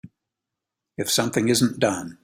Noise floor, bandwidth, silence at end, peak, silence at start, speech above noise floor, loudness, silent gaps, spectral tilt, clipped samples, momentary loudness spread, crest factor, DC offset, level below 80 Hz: -85 dBFS; 16 kHz; 0.1 s; -6 dBFS; 0.05 s; 63 dB; -22 LUFS; none; -4 dB/octave; under 0.1%; 9 LU; 20 dB; under 0.1%; -60 dBFS